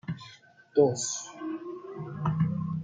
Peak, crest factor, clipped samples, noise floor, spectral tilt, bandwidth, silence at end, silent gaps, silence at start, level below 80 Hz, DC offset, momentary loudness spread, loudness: -10 dBFS; 20 dB; under 0.1%; -54 dBFS; -5.5 dB/octave; 9.6 kHz; 0 s; none; 0.05 s; -64 dBFS; under 0.1%; 16 LU; -30 LUFS